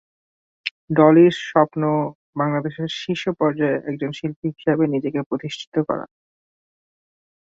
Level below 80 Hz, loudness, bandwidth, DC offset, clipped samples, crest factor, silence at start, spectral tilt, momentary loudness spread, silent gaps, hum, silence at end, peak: -64 dBFS; -21 LUFS; 7.6 kHz; under 0.1%; under 0.1%; 20 dB; 0.65 s; -7 dB/octave; 13 LU; 0.71-0.88 s, 2.15-2.33 s, 4.36-4.42 s, 5.26-5.31 s, 5.67-5.72 s; none; 1.35 s; 0 dBFS